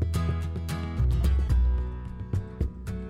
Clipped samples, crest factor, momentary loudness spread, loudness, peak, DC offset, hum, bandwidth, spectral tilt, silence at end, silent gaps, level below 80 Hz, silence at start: under 0.1%; 12 dB; 8 LU; -29 LUFS; -14 dBFS; under 0.1%; none; 13 kHz; -7.5 dB/octave; 0 s; none; -28 dBFS; 0 s